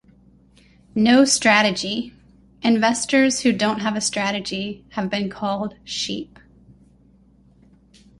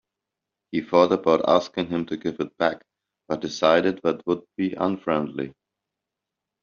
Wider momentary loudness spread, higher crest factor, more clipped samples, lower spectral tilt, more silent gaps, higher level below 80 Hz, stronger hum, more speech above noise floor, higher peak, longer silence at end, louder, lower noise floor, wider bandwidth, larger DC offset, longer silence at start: first, 14 LU vs 11 LU; about the same, 20 dB vs 22 dB; neither; about the same, -3 dB/octave vs -4 dB/octave; neither; first, -56 dBFS vs -64 dBFS; neither; second, 34 dB vs 63 dB; about the same, -2 dBFS vs -4 dBFS; first, 1.95 s vs 1.1 s; first, -20 LUFS vs -24 LUFS; second, -54 dBFS vs -86 dBFS; first, 11.5 kHz vs 7.2 kHz; neither; first, 0.95 s vs 0.75 s